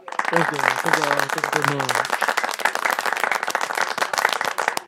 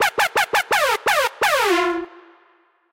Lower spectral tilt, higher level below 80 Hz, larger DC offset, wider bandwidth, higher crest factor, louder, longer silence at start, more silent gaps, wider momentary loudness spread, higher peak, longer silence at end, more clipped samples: first, -2.5 dB/octave vs -1 dB/octave; second, -72 dBFS vs -56 dBFS; neither; about the same, 17 kHz vs 16.5 kHz; first, 22 dB vs 14 dB; second, -21 LUFS vs -18 LUFS; about the same, 0.05 s vs 0 s; neither; second, 3 LU vs 6 LU; first, 0 dBFS vs -6 dBFS; second, 0 s vs 0.7 s; neither